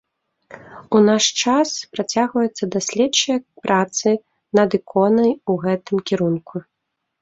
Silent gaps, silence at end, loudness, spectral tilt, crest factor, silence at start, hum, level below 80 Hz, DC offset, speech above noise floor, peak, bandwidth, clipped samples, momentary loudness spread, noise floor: none; 0.6 s; -19 LUFS; -4 dB/octave; 18 dB; 0.5 s; none; -62 dBFS; under 0.1%; 33 dB; -2 dBFS; 8 kHz; under 0.1%; 7 LU; -52 dBFS